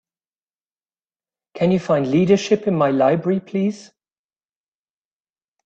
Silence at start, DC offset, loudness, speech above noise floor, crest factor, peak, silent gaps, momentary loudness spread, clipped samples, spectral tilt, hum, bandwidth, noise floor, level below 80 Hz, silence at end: 1.55 s; under 0.1%; -18 LUFS; over 72 dB; 18 dB; -4 dBFS; none; 7 LU; under 0.1%; -7 dB/octave; none; 8.2 kHz; under -90 dBFS; -60 dBFS; 1.85 s